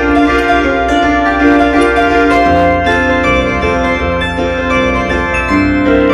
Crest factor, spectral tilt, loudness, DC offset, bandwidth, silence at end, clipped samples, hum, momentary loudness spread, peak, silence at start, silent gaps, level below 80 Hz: 10 dB; -6 dB/octave; -11 LUFS; under 0.1%; 11 kHz; 0 s; under 0.1%; none; 4 LU; 0 dBFS; 0 s; none; -24 dBFS